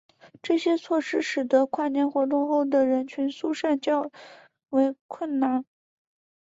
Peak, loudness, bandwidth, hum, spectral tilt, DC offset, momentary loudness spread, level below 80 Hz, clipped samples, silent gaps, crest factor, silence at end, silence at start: -10 dBFS; -25 LUFS; 7.8 kHz; none; -4 dB/octave; under 0.1%; 7 LU; -74 dBFS; under 0.1%; 5.01-5.09 s; 16 dB; 0.85 s; 0.25 s